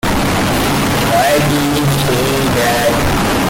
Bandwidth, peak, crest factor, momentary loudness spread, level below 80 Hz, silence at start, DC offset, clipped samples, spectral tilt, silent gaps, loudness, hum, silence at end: 17 kHz; -4 dBFS; 10 dB; 2 LU; -28 dBFS; 0.05 s; under 0.1%; under 0.1%; -4.5 dB/octave; none; -13 LUFS; none; 0 s